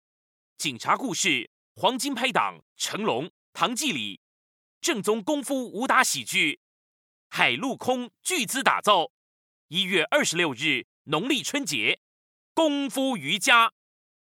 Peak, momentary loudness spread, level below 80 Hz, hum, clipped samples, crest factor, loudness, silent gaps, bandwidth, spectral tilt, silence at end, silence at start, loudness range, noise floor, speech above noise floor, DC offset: -4 dBFS; 10 LU; -82 dBFS; none; under 0.1%; 24 dB; -25 LUFS; 1.47-1.75 s, 2.62-2.76 s, 3.30-3.53 s, 4.17-4.81 s, 6.57-7.30 s, 9.10-9.69 s, 10.84-11.05 s, 11.97-12.55 s; 19 kHz; -2 dB/octave; 0.5 s; 0.6 s; 3 LU; under -90 dBFS; over 65 dB; under 0.1%